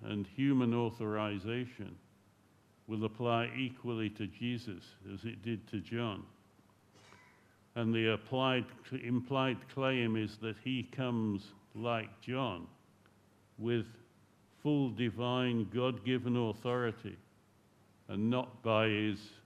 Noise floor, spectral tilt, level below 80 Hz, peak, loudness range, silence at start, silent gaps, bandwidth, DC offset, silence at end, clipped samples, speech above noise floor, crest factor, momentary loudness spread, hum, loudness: -67 dBFS; -7.5 dB/octave; -74 dBFS; -18 dBFS; 6 LU; 0 s; none; 12 kHz; under 0.1%; 0.1 s; under 0.1%; 32 dB; 20 dB; 12 LU; none; -36 LUFS